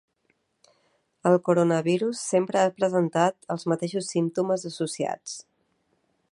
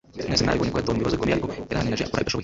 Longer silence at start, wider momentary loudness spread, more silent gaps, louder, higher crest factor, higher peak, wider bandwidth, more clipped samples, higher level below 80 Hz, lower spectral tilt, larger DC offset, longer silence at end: first, 1.25 s vs 0.15 s; first, 9 LU vs 4 LU; neither; about the same, -25 LUFS vs -24 LUFS; about the same, 20 dB vs 18 dB; about the same, -6 dBFS vs -6 dBFS; first, 11.5 kHz vs 8 kHz; neither; second, -74 dBFS vs -40 dBFS; about the same, -5.5 dB/octave vs -5 dB/octave; neither; first, 0.9 s vs 0 s